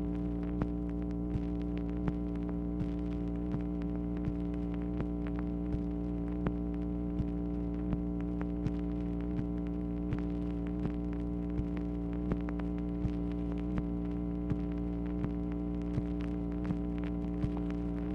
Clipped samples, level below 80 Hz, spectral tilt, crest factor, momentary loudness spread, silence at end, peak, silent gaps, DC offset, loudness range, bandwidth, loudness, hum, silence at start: under 0.1%; -40 dBFS; -10.5 dB/octave; 16 dB; 1 LU; 0 s; -18 dBFS; none; under 0.1%; 0 LU; 5.4 kHz; -36 LUFS; none; 0 s